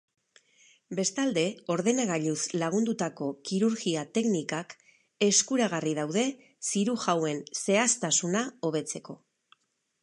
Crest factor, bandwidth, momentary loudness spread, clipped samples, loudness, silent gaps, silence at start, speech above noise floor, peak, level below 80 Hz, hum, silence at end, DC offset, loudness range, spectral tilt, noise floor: 20 dB; 11.5 kHz; 11 LU; under 0.1%; -28 LUFS; none; 0.9 s; 38 dB; -10 dBFS; -78 dBFS; none; 0.85 s; under 0.1%; 2 LU; -3.5 dB/octave; -66 dBFS